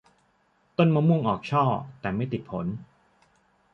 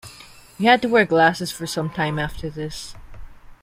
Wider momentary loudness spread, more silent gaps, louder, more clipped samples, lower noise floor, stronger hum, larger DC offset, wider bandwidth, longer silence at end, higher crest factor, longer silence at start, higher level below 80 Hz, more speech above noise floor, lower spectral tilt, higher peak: second, 12 LU vs 17 LU; neither; second, -26 LUFS vs -20 LUFS; neither; first, -67 dBFS vs -45 dBFS; neither; neither; second, 6.4 kHz vs 16 kHz; first, 0.9 s vs 0.1 s; about the same, 18 dB vs 20 dB; first, 0.8 s vs 0.05 s; second, -58 dBFS vs -44 dBFS; first, 42 dB vs 25 dB; first, -9 dB/octave vs -5 dB/octave; second, -8 dBFS vs -2 dBFS